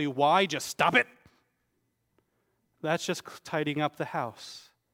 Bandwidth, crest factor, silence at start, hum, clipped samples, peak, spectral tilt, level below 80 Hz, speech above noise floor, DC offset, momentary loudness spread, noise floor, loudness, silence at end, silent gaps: 16.5 kHz; 24 dB; 0 s; none; under 0.1%; -8 dBFS; -4 dB/octave; -74 dBFS; 48 dB; under 0.1%; 14 LU; -77 dBFS; -28 LUFS; 0.35 s; none